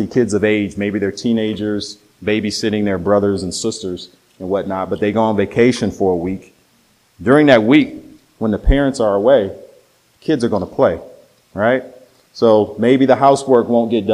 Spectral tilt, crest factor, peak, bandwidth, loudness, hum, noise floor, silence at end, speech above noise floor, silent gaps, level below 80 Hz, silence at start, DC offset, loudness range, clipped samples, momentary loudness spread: -6 dB/octave; 16 dB; 0 dBFS; 12.5 kHz; -16 LUFS; none; -56 dBFS; 0 s; 41 dB; none; -32 dBFS; 0 s; under 0.1%; 4 LU; under 0.1%; 13 LU